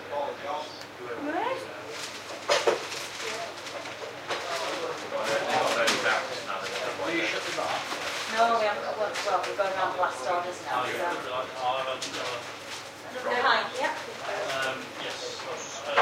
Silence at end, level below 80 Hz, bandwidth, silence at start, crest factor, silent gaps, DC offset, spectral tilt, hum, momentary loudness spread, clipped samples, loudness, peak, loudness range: 0 s; -74 dBFS; 16 kHz; 0 s; 22 dB; none; under 0.1%; -2 dB/octave; none; 12 LU; under 0.1%; -29 LUFS; -8 dBFS; 3 LU